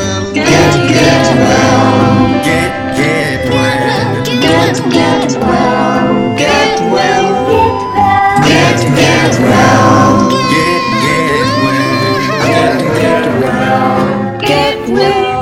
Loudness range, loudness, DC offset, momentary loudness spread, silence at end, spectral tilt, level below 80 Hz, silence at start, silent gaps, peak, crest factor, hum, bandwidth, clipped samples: 3 LU; -9 LUFS; 0.2%; 5 LU; 0 s; -5 dB/octave; -34 dBFS; 0 s; none; 0 dBFS; 10 dB; none; 16.5 kHz; 0.4%